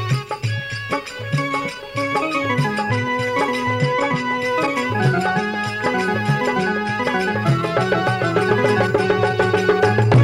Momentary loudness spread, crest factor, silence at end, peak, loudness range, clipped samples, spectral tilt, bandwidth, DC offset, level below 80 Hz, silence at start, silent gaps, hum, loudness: 7 LU; 16 dB; 0 s; -2 dBFS; 3 LU; under 0.1%; -6 dB/octave; 15 kHz; under 0.1%; -50 dBFS; 0 s; none; none; -19 LUFS